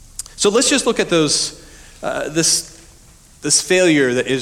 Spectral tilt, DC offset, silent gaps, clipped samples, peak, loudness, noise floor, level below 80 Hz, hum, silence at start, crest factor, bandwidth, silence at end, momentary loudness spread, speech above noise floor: -2.5 dB/octave; under 0.1%; none; under 0.1%; -2 dBFS; -15 LUFS; -46 dBFS; -46 dBFS; none; 0.2 s; 16 dB; 18.5 kHz; 0 s; 14 LU; 30 dB